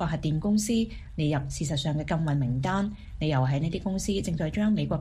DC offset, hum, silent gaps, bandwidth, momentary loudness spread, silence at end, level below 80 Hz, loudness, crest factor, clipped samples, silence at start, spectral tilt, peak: under 0.1%; none; none; 15 kHz; 4 LU; 0 s; -42 dBFS; -28 LUFS; 14 dB; under 0.1%; 0 s; -6 dB/octave; -14 dBFS